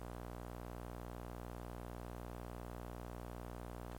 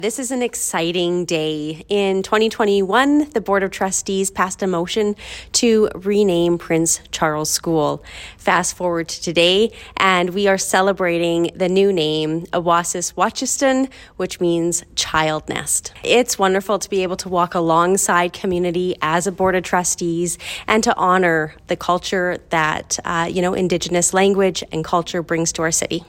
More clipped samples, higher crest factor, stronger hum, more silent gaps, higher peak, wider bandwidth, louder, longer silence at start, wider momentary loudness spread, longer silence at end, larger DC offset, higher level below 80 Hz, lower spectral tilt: neither; about the same, 16 dB vs 18 dB; first, 60 Hz at -50 dBFS vs none; neither; second, -32 dBFS vs 0 dBFS; about the same, 16.5 kHz vs 16.5 kHz; second, -50 LUFS vs -18 LUFS; about the same, 0 s vs 0 s; second, 0 LU vs 6 LU; about the same, 0 s vs 0.05 s; neither; about the same, -52 dBFS vs -48 dBFS; first, -6.5 dB/octave vs -3.5 dB/octave